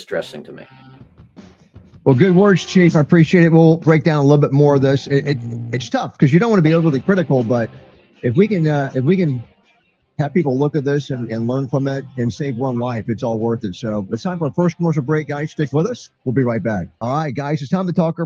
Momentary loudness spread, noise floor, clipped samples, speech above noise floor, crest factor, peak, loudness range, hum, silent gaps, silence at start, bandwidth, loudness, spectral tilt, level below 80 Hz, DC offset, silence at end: 12 LU; -60 dBFS; under 0.1%; 44 dB; 16 dB; 0 dBFS; 8 LU; none; none; 0 s; 7.4 kHz; -17 LUFS; -8 dB/octave; -54 dBFS; under 0.1%; 0 s